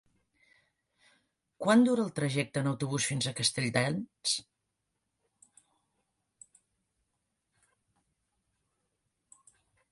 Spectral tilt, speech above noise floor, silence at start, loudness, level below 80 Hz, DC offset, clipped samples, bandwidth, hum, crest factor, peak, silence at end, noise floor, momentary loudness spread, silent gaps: -4.5 dB/octave; 54 dB; 1.6 s; -30 LUFS; -72 dBFS; under 0.1%; under 0.1%; 11.5 kHz; none; 22 dB; -12 dBFS; 5.5 s; -83 dBFS; 9 LU; none